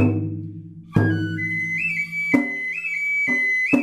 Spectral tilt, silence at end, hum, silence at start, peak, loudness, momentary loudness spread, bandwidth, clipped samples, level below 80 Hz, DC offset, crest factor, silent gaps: -7 dB/octave; 0 s; none; 0 s; -4 dBFS; -21 LUFS; 10 LU; 13.5 kHz; under 0.1%; -54 dBFS; under 0.1%; 18 dB; none